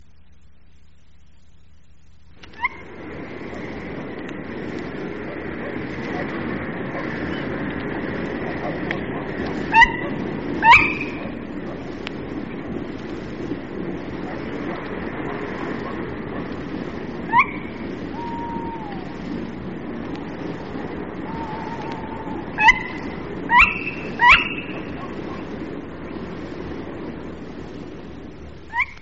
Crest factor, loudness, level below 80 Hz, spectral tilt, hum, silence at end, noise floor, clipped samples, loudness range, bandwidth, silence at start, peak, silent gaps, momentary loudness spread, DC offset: 24 dB; -23 LUFS; -44 dBFS; -2.5 dB/octave; none; 0 s; -53 dBFS; under 0.1%; 14 LU; 7.6 kHz; 2.4 s; 0 dBFS; none; 18 LU; 0.8%